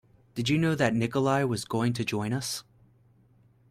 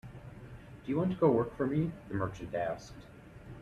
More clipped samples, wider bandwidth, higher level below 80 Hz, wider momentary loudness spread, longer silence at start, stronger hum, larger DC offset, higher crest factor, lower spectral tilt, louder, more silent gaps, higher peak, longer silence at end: neither; first, 16 kHz vs 12 kHz; about the same, -60 dBFS vs -58 dBFS; second, 8 LU vs 22 LU; first, 0.35 s vs 0.05 s; neither; neither; about the same, 18 dB vs 18 dB; second, -5.5 dB/octave vs -8.5 dB/octave; first, -28 LUFS vs -33 LUFS; neither; first, -12 dBFS vs -16 dBFS; first, 1.1 s vs 0 s